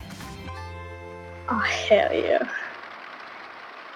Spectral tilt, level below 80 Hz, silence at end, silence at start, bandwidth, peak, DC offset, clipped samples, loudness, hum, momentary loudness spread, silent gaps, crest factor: -4.5 dB/octave; -52 dBFS; 0 s; 0 s; 14 kHz; -6 dBFS; under 0.1%; under 0.1%; -24 LUFS; none; 20 LU; none; 22 dB